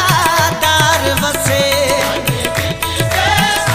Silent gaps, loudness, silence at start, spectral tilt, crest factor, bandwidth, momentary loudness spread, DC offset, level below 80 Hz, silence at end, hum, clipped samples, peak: none; -13 LUFS; 0 s; -3 dB/octave; 14 dB; 16 kHz; 5 LU; under 0.1%; -34 dBFS; 0 s; none; under 0.1%; 0 dBFS